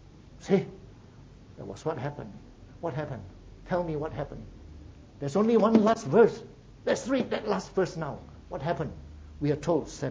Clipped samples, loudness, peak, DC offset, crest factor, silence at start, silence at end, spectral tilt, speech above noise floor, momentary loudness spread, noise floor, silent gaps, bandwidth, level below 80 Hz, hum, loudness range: under 0.1%; -28 LUFS; -6 dBFS; under 0.1%; 24 dB; 0.1 s; 0 s; -6.5 dB/octave; 23 dB; 23 LU; -51 dBFS; none; 8 kHz; -52 dBFS; none; 10 LU